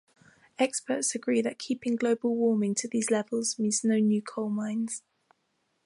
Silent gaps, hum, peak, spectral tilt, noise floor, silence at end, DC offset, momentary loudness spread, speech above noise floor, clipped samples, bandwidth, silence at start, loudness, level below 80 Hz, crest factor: none; none; -12 dBFS; -4 dB/octave; -75 dBFS; 0.85 s; under 0.1%; 7 LU; 48 dB; under 0.1%; 11.5 kHz; 0.6 s; -28 LUFS; -80 dBFS; 16 dB